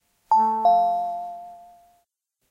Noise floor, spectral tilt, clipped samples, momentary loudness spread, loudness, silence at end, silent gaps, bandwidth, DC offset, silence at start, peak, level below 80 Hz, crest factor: -74 dBFS; -6 dB/octave; under 0.1%; 17 LU; -21 LUFS; 0.95 s; none; 7 kHz; under 0.1%; 0.3 s; -10 dBFS; -68 dBFS; 14 dB